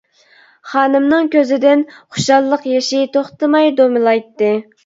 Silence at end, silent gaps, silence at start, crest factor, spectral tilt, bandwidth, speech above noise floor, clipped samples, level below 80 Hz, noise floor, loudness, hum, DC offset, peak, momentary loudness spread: 0.25 s; none; 0.65 s; 14 dB; -4.5 dB/octave; 7.8 kHz; 36 dB; under 0.1%; -62 dBFS; -49 dBFS; -14 LUFS; none; under 0.1%; 0 dBFS; 5 LU